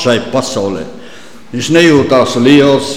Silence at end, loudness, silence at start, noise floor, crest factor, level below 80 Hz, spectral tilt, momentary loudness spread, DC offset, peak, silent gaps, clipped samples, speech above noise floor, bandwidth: 0 s; -10 LUFS; 0 s; -35 dBFS; 10 dB; -46 dBFS; -5 dB/octave; 15 LU; 2%; 0 dBFS; none; under 0.1%; 25 dB; 15 kHz